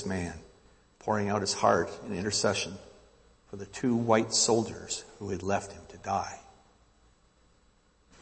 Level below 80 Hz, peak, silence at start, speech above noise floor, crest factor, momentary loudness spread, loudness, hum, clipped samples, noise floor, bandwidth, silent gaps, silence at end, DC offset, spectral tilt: -60 dBFS; -10 dBFS; 0 s; 35 dB; 22 dB; 18 LU; -30 LUFS; none; under 0.1%; -65 dBFS; 8.8 kHz; none; 1.8 s; under 0.1%; -3.5 dB/octave